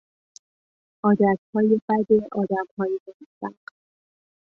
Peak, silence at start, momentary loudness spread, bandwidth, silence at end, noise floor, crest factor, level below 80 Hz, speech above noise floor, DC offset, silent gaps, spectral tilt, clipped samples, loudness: -6 dBFS; 1.05 s; 16 LU; 7 kHz; 1.05 s; under -90 dBFS; 18 dB; -66 dBFS; over 68 dB; under 0.1%; 1.38-1.53 s, 1.82-1.88 s, 2.71-2.77 s, 3.00-3.06 s, 3.14-3.20 s, 3.26-3.41 s; -9 dB/octave; under 0.1%; -22 LUFS